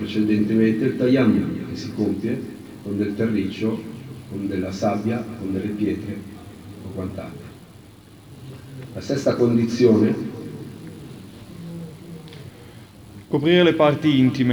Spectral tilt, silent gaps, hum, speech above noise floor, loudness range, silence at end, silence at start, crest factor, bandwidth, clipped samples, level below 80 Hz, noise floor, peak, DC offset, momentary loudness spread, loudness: -7 dB/octave; none; none; 25 dB; 9 LU; 0 s; 0 s; 18 dB; over 20 kHz; under 0.1%; -56 dBFS; -45 dBFS; -4 dBFS; under 0.1%; 23 LU; -21 LUFS